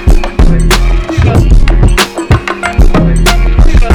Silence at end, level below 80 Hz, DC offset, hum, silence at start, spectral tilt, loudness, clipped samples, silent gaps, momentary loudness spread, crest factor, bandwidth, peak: 0 s; -8 dBFS; under 0.1%; none; 0 s; -5.5 dB/octave; -9 LUFS; 10%; none; 3 LU; 6 dB; 17.5 kHz; 0 dBFS